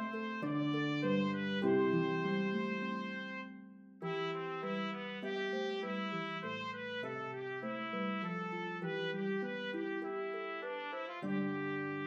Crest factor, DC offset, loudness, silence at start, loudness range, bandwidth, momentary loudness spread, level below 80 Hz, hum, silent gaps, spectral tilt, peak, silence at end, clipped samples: 16 dB; under 0.1%; -38 LUFS; 0 s; 5 LU; 7.4 kHz; 8 LU; under -90 dBFS; none; none; -7 dB/octave; -22 dBFS; 0 s; under 0.1%